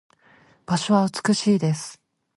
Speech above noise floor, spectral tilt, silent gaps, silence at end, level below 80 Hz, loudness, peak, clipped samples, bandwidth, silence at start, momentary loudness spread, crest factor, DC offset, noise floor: 35 dB; -5.5 dB/octave; none; 0.45 s; -64 dBFS; -22 LUFS; -6 dBFS; under 0.1%; 11.5 kHz; 0.7 s; 9 LU; 18 dB; under 0.1%; -56 dBFS